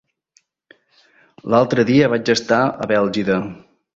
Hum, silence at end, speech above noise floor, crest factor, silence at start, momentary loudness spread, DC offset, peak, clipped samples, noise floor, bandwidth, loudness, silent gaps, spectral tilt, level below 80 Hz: none; 0.4 s; 45 dB; 18 dB; 1.45 s; 7 LU; under 0.1%; -2 dBFS; under 0.1%; -61 dBFS; 8 kHz; -17 LUFS; none; -5.5 dB/octave; -54 dBFS